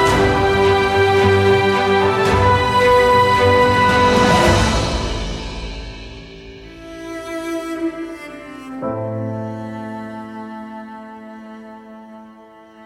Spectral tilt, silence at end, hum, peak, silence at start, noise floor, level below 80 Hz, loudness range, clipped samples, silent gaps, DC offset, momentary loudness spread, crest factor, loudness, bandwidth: -5 dB/octave; 0 s; none; -2 dBFS; 0 s; -43 dBFS; -32 dBFS; 15 LU; under 0.1%; none; under 0.1%; 23 LU; 16 dB; -15 LUFS; 15 kHz